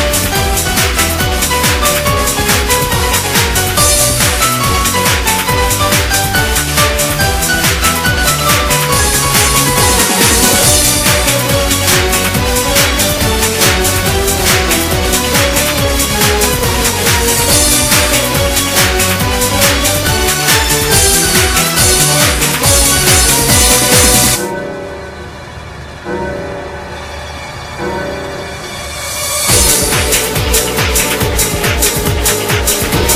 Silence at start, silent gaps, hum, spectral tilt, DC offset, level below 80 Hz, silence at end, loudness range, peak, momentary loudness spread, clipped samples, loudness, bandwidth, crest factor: 0 s; none; none; -2.5 dB/octave; under 0.1%; -22 dBFS; 0 s; 6 LU; 0 dBFS; 13 LU; 0.2%; -9 LUFS; over 20 kHz; 12 dB